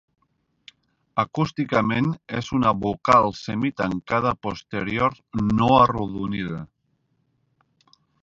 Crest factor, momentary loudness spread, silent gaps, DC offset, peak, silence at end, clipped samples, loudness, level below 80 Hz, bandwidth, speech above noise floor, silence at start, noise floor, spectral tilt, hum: 22 dB; 12 LU; none; under 0.1%; -2 dBFS; 1.6 s; under 0.1%; -22 LUFS; -48 dBFS; 7.8 kHz; 48 dB; 1.15 s; -70 dBFS; -7 dB/octave; none